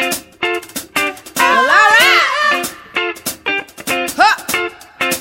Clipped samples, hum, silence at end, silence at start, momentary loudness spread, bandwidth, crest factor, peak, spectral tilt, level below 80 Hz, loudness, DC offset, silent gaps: under 0.1%; none; 0 s; 0 s; 12 LU; 16.5 kHz; 16 dB; 0 dBFS; -1 dB/octave; -54 dBFS; -13 LUFS; under 0.1%; none